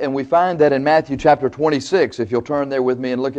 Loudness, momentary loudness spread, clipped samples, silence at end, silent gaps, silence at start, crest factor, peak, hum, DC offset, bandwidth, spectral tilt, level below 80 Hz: -17 LUFS; 6 LU; under 0.1%; 0 s; none; 0 s; 14 dB; -2 dBFS; none; under 0.1%; 8.6 kHz; -6 dB/octave; -50 dBFS